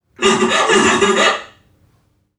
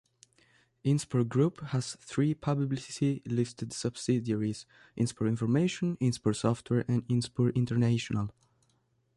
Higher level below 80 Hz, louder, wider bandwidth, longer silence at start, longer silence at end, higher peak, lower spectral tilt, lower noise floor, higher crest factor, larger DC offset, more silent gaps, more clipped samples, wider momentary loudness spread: first, -52 dBFS vs -62 dBFS; first, -13 LUFS vs -31 LUFS; about the same, 12 kHz vs 11.5 kHz; second, 0.2 s vs 0.85 s; about the same, 0.9 s vs 0.85 s; first, 0 dBFS vs -14 dBFS; second, -2.5 dB/octave vs -6.5 dB/octave; second, -59 dBFS vs -72 dBFS; about the same, 16 dB vs 16 dB; neither; neither; neither; second, 4 LU vs 7 LU